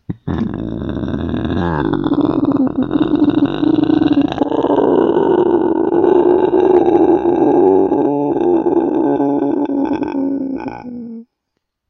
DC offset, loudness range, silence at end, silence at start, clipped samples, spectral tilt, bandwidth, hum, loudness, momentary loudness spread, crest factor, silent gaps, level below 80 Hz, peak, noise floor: under 0.1%; 5 LU; 0.65 s; 0.1 s; under 0.1%; -9.5 dB/octave; 5.8 kHz; none; -14 LUFS; 10 LU; 14 dB; none; -40 dBFS; 0 dBFS; -73 dBFS